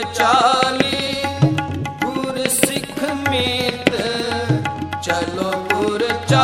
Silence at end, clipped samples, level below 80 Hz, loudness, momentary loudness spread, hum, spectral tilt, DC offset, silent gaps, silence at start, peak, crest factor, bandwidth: 0 s; under 0.1%; -48 dBFS; -19 LUFS; 7 LU; none; -4 dB/octave; under 0.1%; none; 0 s; 0 dBFS; 18 dB; 16 kHz